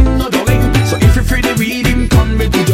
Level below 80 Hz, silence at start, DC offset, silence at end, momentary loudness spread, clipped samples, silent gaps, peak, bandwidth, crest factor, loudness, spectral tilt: -16 dBFS; 0 s; under 0.1%; 0 s; 3 LU; under 0.1%; none; 0 dBFS; 16.5 kHz; 10 dB; -12 LUFS; -5.5 dB/octave